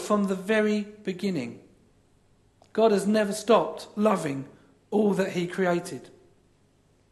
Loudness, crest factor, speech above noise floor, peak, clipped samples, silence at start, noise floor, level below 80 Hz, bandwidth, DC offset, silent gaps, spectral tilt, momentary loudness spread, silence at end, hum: -26 LUFS; 20 dB; 38 dB; -8 dBFS; under 0.1%; 0 s; -63 dBFS; -68 dBFS; 12.5 kHz; under 0.1%; none; -6 dB/octave; 12 LU; 1 s; none